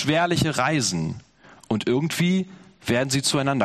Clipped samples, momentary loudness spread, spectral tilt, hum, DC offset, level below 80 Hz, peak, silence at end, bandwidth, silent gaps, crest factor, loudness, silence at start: under 0.1%; 11 LU; -4.5 dB/octave; none; under 0.1%; -52 dBFS; -4 dBFS; 0 s; 13.5 kHz; none; 18 dB; -23 LUFS; 0 s